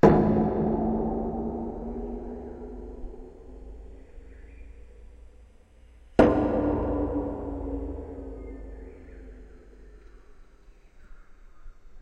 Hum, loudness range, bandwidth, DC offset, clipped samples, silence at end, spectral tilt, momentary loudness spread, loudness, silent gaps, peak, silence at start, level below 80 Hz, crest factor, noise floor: none; 20 LU; 8.4 kHz; under 0.1%; under 0.1%; 0 s; -9.5 dB/octave; 27 LU; -27 LUFS; none; -4 dBFS; 0.05 s; -40 dBFS; 24 dB; -53 dBFS